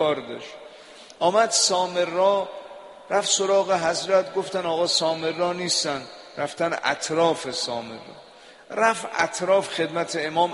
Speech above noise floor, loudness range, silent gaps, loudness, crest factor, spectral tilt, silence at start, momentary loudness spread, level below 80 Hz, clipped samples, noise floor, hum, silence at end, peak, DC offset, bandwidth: 22 dB; 4 LU; none; -23 LUFS; 20 dB; -2 dB/octave; 0 s; 17 LU; -68 dBFS; under 0.1%; -46 dBFS; none; 0 s; -4 dBFS; under 0.1%; 11.5 kHz